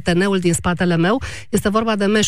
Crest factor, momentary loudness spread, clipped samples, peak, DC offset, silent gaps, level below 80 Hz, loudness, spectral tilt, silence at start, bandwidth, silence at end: 12 dB; 4 LU; under 0.1%; -6 dBFS; 2%; none; -40 dBFS; -18 LUFS; -5 dB/octave; 0.05 s; 15.5 kHz; 0 s